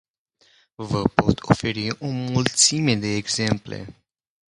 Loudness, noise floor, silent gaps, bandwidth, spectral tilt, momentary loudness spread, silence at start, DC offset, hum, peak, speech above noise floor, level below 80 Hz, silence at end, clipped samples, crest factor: -21 LUFS; -62 dBFS; none; 11.5 kHz; -4 dB/octave; 17 LU; 0.8 s; under 0.1%; none; 0 dBFS; 40 dB; -46 dBFS; 0.6 s; under 0.1%; 22 dB